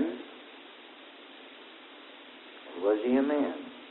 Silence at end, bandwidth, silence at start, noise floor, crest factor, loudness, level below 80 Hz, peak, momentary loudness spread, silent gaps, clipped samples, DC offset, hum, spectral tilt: 0 s; 4.2 kHz; 0 s; -50 dBFS; 18 dB; -30 LUFS; -76 dBFS; -14 dBFS; 22 LU; none; under 0.1%; under 0.1%; none; -8 dB/octave